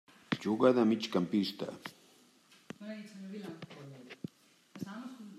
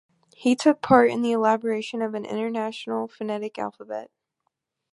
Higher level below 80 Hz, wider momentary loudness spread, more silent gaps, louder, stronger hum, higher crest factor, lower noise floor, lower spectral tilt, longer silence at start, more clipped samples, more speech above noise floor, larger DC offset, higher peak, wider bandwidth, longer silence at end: second, -82 dBFS vs -62 dBFS; first, 21 LU vs 14 LU; neither; second, -33 LUFS vs -24 LUFS; neither; about the same, 24 dB vs 22 dB; second, -64 dBFS vs -78 dBFS; about the same, -6.5 dB/octave vs -5.5 dB/octave; about the same, 0.3 s vs 0.4 s; neither; second, 32 dB vs 55 dB; neither; second, -12 dBFS vs -2 dBFS; first, 14 kHz vs 11.5 kHz; second, 0 s vs 0.85 s